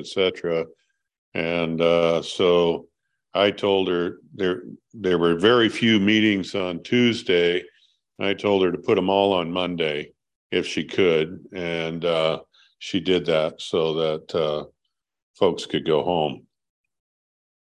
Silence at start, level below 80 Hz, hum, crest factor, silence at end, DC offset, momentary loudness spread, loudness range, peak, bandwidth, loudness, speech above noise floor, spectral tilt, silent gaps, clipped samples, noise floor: 0 s; -56 dBFS; none; 18 dB; 1.4 s; under 0.1%; 10 LU; 5 LU; -4 dBFS; 10.5 kHz; -22 LUFS; 58 dB; -5.5 dB/octave; 1.18-1.32 s, 10.36-10.50 s, 15.22-15.34 s; under 0.1%; -80 dBFS